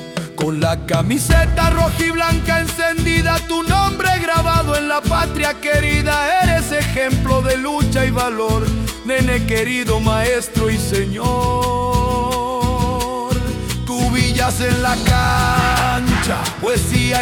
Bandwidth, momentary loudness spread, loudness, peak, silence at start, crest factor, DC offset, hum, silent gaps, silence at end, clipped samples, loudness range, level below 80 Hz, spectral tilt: 18 kHz; 5 LU; -17 LUFS; -2 dBFS; 0 s; 14 dB; under 0.1%; none; none; 0 s; under 0.1%; 2 LU; -26 dBFS; -5 dB/octave